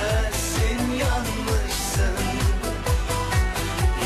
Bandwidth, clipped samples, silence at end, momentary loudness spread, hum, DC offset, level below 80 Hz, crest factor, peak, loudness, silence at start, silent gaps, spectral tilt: 15 kHz; under 0.1%; 0 s; 2 LU; none; under 0.1%; -26 dBFS; 12 dB; -10 dBFS; -24 LUFS; 0 s; none; -4.5 dB/octave